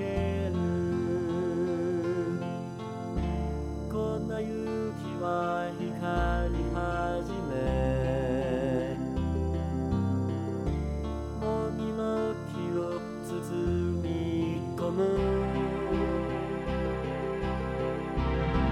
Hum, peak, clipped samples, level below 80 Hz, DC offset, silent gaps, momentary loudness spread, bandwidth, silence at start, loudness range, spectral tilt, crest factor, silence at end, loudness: none; -16 dBFS; under 0.1%; -40 dBFS; under 0.1%; none; 5 LU; 14 kHz; 0 s; 2 LU; -8 dB/octave; 14 dB; 0 s; -31 LUFS